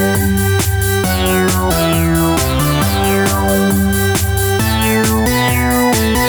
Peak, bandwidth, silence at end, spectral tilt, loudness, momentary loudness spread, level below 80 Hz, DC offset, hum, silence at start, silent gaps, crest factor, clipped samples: -2 dBFS; over 20 kHz; 0 s; -4.5 dB/octave; -13 LUFS; 1 LU; -24 dBFS; under 0.1%; none; 0 s; none; 12 dB; under 0.1%